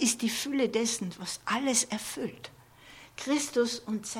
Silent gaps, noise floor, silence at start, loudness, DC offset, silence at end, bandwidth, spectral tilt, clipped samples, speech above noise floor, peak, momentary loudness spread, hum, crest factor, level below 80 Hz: none; -53 dBFS; 0 s; -30 LUFS; under 0.1%; 0 s; 17 kHz; -2.5 dB/octave; under 0.1%; 22 dB; -12 dBFS; 16 LU; none; 18 dB; -68 dBFS